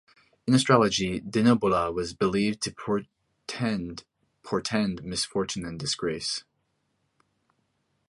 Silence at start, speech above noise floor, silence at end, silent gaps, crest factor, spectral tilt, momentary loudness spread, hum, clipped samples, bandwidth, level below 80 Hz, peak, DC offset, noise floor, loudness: 0.45 s; 49 dB; 1.7 s; none; 22 dB; -5 dB/octave; 12 LU; none; under 0.1%; 11.5 kHz; -56 dBFS; -6 dBFS; under 0.1%; -75 dBFS; -26 LUFS